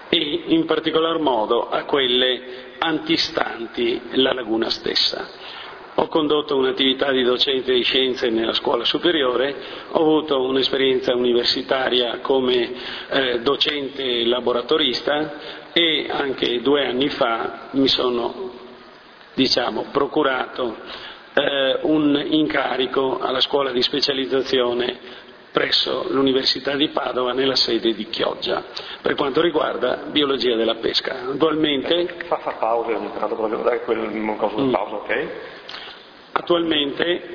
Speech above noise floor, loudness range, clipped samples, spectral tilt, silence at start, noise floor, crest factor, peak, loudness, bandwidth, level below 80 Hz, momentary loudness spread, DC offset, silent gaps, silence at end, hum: 24 dB; 3 LU; under 0.1%; -4.5 dB/octave; 0 s; -44 dBFS; 20 dB; 0 dBFS; -20 LUFS; 5.4 kHz; -56 dBFS; 9 LU; under 0.1%; none; 0 s; none